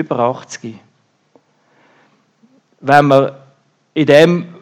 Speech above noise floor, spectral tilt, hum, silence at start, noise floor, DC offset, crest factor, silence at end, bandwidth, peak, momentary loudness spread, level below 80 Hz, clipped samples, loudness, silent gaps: 43 dB; -6 dB/octave; none; 0 s; -55 dBFS; under 0.1%; 16 dB; 0.15 s; 14.5 kHz; 0 dBFS; 20 LU; -60 dBFS; 0.2%; -12 LUFS; none